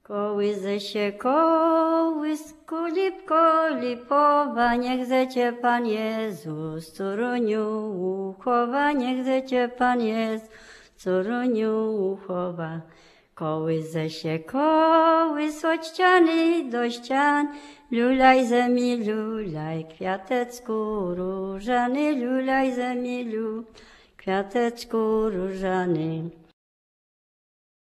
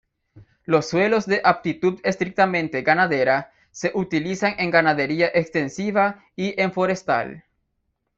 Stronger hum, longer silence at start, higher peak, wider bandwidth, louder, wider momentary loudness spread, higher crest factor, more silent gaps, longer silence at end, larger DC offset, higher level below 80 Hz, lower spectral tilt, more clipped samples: neither; second, 0.1 s vs 0.35 s; second, -6 dBFS vs -2 dBFS; first, 13.5 kHz vs 8 kHz; second, -24 LUFS vs -21 LUFS; first, 11 LU vs 7 LU; about the same, 18 dB vs 20 dB; neither; first, 1.5 s vs 0.8 s; neither; about the same, -56 dBFS vs -60 dBFS; about the same, -6 dB/octave vs -5.5 dB/octave; neither